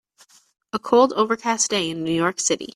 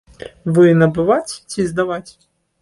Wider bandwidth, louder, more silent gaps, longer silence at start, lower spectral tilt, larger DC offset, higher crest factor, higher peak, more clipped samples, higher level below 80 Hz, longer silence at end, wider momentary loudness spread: first, 13.5 kHz vs 11.5 kHz; second, -21 LUFS vs -16 LUFS; neither; first, 0.75 s vs 0.2 s; second, -3 dB/octave vs -7 dB/octave; neither; about the same, 18 dB vs 14 dB; about the same, -4 dBFS vs -2 dBFS; neither; second, -64 dBFS vs -50 dBFS; second, 0.1 s vs 0.5 s; second, 7 LU vs 16 LU